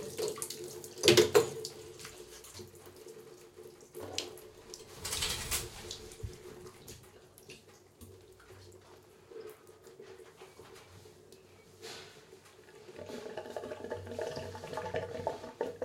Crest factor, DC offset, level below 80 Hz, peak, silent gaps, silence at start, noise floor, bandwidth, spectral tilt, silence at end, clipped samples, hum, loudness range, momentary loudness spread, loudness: 34 dB; under 0.1%; -62 dBFS; -6 dBFS; none; 0 s; -58 dBFS; 16.5 kHz; -3 dB/octave; 0 s; under 0.1%; none; 22 LU; 23 LU; -35 LUFS